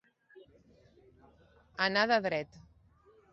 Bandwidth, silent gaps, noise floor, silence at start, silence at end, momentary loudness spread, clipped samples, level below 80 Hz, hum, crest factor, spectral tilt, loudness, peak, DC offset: 7.6 kHz; none; -64 dBFS; 0.35 s; 0.75 s; 21 LU; under 0.1%; -68 dBFS; none; 22 dB; -1.5 dB/octave; -30 LUFS; -14 dBFS; under 0.1%